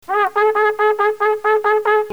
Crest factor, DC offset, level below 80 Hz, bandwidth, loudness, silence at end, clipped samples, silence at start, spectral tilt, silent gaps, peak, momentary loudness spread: 12 dB; 0.4%; -64 dBFS; 17.5 kHz; -16 LUFS; 0 s; under 0.1%; 0.1 s; -3.5 dB/octave; none; -4 dBFS; 2 LU